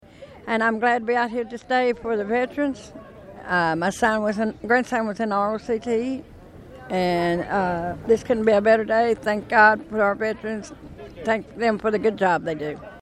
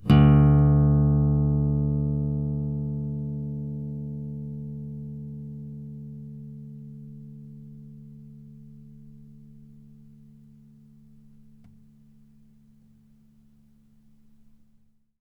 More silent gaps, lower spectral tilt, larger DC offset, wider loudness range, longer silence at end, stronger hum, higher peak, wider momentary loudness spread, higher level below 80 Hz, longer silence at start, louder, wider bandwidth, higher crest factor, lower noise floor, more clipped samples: neither; second, -5.5 dB/octave vs -10.5 dB/octave; neither; second, 4 LU vs 26 LU; second, 0 s vs 5.55 s; neither; first, -2 dBFS vs -8 dBFS; second, 13 LU vs 27 LU; second, -52 dBFS vs -38 dBFS; first, 0.2 s vs 0 s; about the same, -22 LUFS vs -24 LUFS; first, 13.5 kHz vs 3.8 kHz; about the same, 20 dB vs 20 dB; second, -43 dBFS vs -61 dBFS; neither